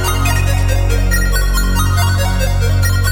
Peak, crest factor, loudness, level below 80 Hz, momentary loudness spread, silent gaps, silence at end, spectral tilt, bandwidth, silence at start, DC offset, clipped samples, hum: -2 dBFS; 12 dB; -15 LUFS; -16 dBFS; 2 LU; none; 0 s; -4.5 dB/octave; 17 kHz; 0 s; under 0.1%; under 0.1%; none